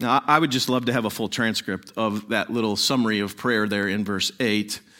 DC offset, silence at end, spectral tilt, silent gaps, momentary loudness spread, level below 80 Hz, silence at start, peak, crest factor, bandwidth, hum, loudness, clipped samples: under 0.1%; 0.2 s; -4 dB/octave; none; 7 LU; -64 dBFS; 0 s; -2 dBFS; 22 dB; 17 kHz; none; -23 LUFS; under 0.1%